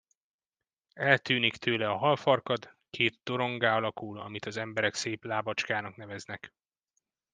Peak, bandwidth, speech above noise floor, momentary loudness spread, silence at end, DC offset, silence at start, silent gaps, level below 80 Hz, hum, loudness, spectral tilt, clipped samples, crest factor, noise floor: -6 dBFS; 10 kHz; over 60 dB; 15 LU; 0.85 s; under 0.1%; 0.95 s; none; -74 dBFS; none; -29 LUFS; -4.5 dB/octave; under 0.1%; 26 dB; under -90 dBFS